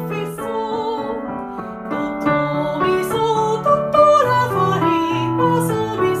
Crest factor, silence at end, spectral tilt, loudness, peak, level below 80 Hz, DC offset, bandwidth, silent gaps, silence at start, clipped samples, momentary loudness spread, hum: 16 dB; 0 s; -6 dB/octave; -18 LUFS; -2 dBFS; -50 dBFS; under 0.1%; 15.5 kHz; none; 0 s; under 0.1%; 12 LU; none